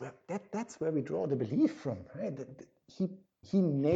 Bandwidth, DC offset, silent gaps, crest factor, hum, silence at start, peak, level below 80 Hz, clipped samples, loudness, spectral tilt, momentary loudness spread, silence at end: 8 kHz; under 0.1%; none; 16 dB; none; 0 s; -18 dBFS; -74 dBFS; under 0.1%; -35 LUFS; -8.5 dB/octave; 14 LU; 0 s